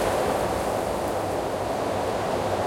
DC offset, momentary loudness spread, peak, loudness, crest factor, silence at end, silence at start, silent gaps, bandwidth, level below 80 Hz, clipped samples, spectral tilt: under 0.1%; 3 LU; -12 dBFS; -26 LUFS; 14 dB; 0 s; 0 s; none; 16.5 kHz; -44 dBFS; under 0.1%; -5 dB/octave